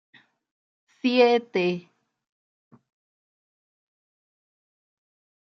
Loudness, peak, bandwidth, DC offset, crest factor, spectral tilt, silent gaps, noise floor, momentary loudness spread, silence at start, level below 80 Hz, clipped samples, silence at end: -23 LUFS; -6 dBFS; 6.4 kHz; under 0.1%; 24 dB; -6 dB/octave; none; under -90 dBFS; 10 LU; 1.05 s; -82 dBFS; under 0.1%; 3.75 s